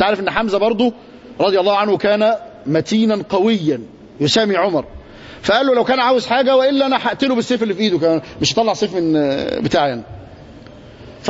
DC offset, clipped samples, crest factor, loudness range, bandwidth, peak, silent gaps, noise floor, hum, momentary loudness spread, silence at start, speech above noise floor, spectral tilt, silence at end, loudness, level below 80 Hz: under 0.1%; under 0.1%; 16 dB; 2 LU; 8 kHz; -2 dBFS; none; -38 dBFS; none; 7 LU; 0 s; 23 dB; -5 dB/octave; 0 s; -16 LUFS; -48 dBFS